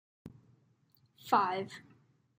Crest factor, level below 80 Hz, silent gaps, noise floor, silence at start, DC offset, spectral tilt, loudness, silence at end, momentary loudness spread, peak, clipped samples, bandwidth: 26 dB; -78 dBFS; none; -70 dBFS; 0.25 s; under 0.1%; -5 dB/octave; -32 LUFS; 0.6 s; 26 LU; -12 dBFS; under 0.1%; 15.5 kHz